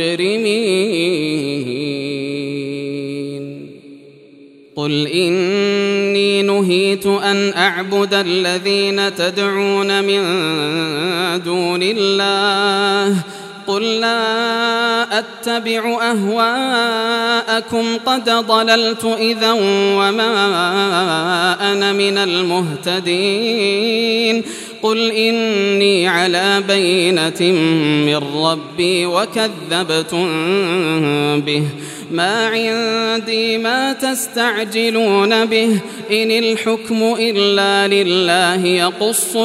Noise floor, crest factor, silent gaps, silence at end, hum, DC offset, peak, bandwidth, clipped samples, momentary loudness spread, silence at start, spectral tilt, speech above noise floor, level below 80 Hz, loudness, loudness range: -43 dBFS; 16 dB; none; 0 s; none; under 0.1%; 0 dBFS; 15.5 kHz; under 0.1%; 6 LU; 0 s; -4 dB/octave; 27 dB; -66 dBFS; -15 LUFS; 3 LU